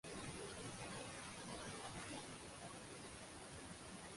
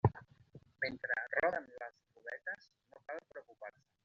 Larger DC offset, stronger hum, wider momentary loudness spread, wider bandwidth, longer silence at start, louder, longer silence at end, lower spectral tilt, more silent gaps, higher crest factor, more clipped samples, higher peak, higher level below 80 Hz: neither; neither; second, 4 LU vs 20 LU; first, 11.5 kHz vs 7 kHz; about the same, 0.05 s vs 0.05 s; second, -51 LUFS vs -40 LUFS; second, 0 s vs 0.35 s; second, -3 dB/octave vs -5 dB/octave; neither; second, 16 dB vs 26 dB; neither; second, -36 dBFS vs -14 dBFS; about the same, -68 dBFS vs -66 dBFS